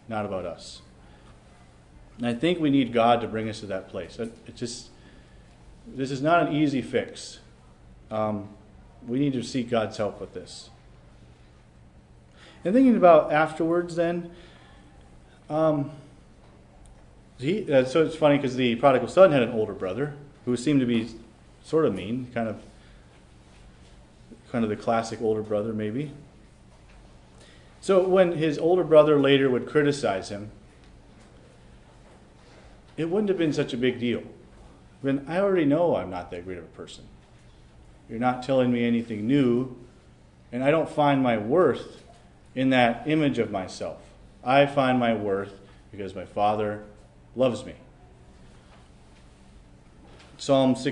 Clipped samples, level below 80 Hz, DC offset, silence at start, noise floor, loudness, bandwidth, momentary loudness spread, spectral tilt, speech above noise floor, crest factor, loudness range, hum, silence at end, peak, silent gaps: under 0.1%; -56 dBFS; under 0.1%; 0.1 s; -53 dBFS; -24 LUFS; 10.5 kHz; 18 LU; -6.5 dB/octave; 29 dB; 22 dB; 9 LU; none; 0 s; -4 dBFS; none